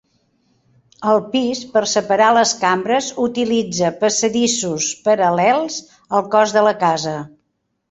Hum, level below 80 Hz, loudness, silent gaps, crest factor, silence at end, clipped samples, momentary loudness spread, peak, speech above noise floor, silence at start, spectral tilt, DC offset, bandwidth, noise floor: none; -60 dBFS; -17 LUFS; none; 16 dB; 0.65 s; under 0.1%; 8 LU; -2 dBFS; 54 dB; 1 s; -3 dB/octave; under 0.1%; 8.4 kHz; -71 dBFS